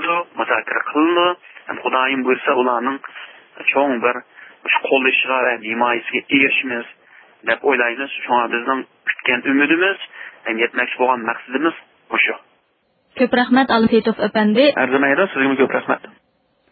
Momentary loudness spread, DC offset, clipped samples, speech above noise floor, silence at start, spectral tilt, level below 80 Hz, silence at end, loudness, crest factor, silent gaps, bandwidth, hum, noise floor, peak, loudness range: 13 LU; under 0.1%; under 0.1%; 46 dB; 0 s; -9.5 dB/octave; -64 dBFS; 0.65 s; -17 LUFS; 18 dB; none; 4.8 kHz; none; -63 dBFS; -2 dBFS; 3 LU